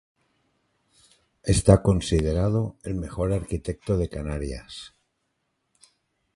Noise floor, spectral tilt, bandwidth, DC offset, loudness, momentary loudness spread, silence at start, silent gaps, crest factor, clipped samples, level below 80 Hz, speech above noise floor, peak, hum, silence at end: -76 dBFS; -6.5 dB/octave; 11.5 kHz; under 0.1%; -25 LUFS; 17 LU; 1.45 s; none; 24 dB; under 0.1%; -36 dBFS; 52 dB; -2 dBFS; none; 1.5 s